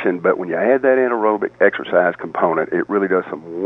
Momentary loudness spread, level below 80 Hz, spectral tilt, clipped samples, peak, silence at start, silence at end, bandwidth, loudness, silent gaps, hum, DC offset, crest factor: 5 LU; -64 dBFS; -8.5 dB/octave; under 0.1%; 0 dBFS; 0 s; 0 s; 3.9 kHz; -17 LUFS; none; none; under 0.1%; 16 dB